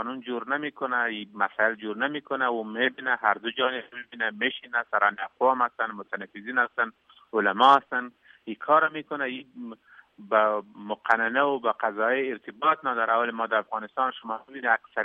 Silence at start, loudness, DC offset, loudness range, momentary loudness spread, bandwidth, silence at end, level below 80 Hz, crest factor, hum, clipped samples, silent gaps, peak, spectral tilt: 0 s; -26 LUFS; under 0.1%; 3 LU; 13 LU; 8.2 kHz; 0 s; -82 dBFS; 22 dB; none; under 0.1%; none; -4 dBFS; -5 dB/octave